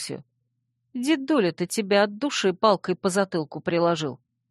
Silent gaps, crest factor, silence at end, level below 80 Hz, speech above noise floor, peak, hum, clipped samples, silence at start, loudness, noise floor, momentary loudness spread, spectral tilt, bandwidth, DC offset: none; 20 dB; 0.35 s; -70 dBFS; 52 dB; -4 dBFS; none; under 0.1%; 0 s; -24 LUFS; -75 dBFS; 10 LU; -4.5 dB/octave; 12.5 kHz; under 0.1%